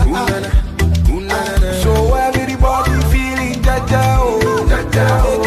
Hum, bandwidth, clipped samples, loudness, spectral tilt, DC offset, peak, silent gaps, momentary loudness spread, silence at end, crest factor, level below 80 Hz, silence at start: none; 14.5 kHz; under 0.1%; -15 LUFS; -6 dB/octave; under 0.1%; -2 dBFS; none; 4 LU; 0 s; 12 dB; -16 dBFS; 0 s